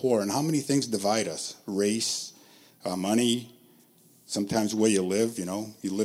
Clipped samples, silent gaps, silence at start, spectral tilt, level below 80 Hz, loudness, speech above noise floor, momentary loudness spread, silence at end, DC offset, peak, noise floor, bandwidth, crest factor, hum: under 0.1%; none; 0 s; -4 dB/octave; -72 dBFS; -27 LUFS; 32 dB; 10 LU; 0 s; under 0.1%; -10 dBFS; -59 dBFS; 16.5 kHz; 18 dB; none